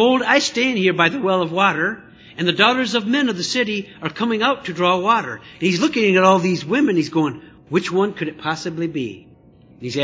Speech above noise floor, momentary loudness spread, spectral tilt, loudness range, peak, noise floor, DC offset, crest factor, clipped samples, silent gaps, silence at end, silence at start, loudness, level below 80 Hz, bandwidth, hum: 30 dB; 10 LU; -4.5 dB/octave; 3 LU; 0 dBFS; -48 dBFS; under 0.1%; 18 dB; under 0.1%; none; 0 s; 0 s; -18 LUFS; -58 dBFS; 8 kHz; none